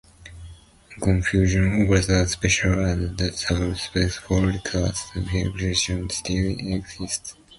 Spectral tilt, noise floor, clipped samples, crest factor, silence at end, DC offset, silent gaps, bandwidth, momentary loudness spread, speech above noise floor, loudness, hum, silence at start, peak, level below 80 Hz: -4.5 dB/octave; -46 dBFS; under 0.1%; 18 dB; 0.05 s; under 0.1%; none; 11.5 kHz; 9 LU; 24 dB; -23 LUFS; none; 0.2 s; -6 dBFS; -34 dBFS